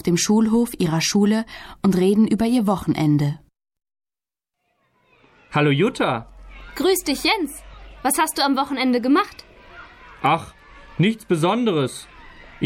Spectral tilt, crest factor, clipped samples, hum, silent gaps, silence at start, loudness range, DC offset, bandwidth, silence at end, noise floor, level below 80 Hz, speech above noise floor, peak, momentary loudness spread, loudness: -5 dB/octave; 14 dB; under 0.1%; none; none; 0.05 s; 5 LU; under 0.1%; 16.5 kHz; 0 s; under -90 dBFS; -48 dBFS; over 71 dB; -8 dBFS; 11 LU; -20 LUFS